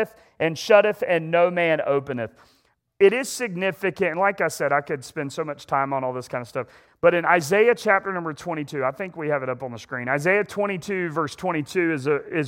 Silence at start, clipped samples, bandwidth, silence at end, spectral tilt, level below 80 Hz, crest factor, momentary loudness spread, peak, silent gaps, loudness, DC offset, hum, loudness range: 0 s; under 0.1%; 17 kHz; 0 s; -5 dB/octave; -66 dBFS; 20 dB; 13 LU; -2 dBFS; none; -23 LUFS; under 0.1%; none; 4 LU